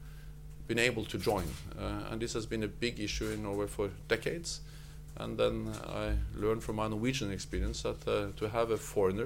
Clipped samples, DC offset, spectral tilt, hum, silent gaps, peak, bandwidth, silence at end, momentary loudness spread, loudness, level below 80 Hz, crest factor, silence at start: under 0.1%; under 0.1%; -5 dB/octave; none; none; -14 dBFS; 17 kHz; 0 s; 10 LU; -35 LUFS; -44 dBFS; 22 dB; 0 s